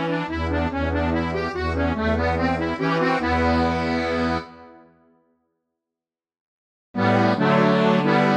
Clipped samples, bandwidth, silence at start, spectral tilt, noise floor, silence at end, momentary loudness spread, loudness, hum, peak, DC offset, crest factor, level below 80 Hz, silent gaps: under 0.1%; 9.4 kHz; 0 s; -7 dB/octave; -89 dBFS; 0 s; 7 LU; -21 LUFS; none; -6 dBFS; under 0.1%; 18 dB; -38 dBFS; 6.40-6.94 s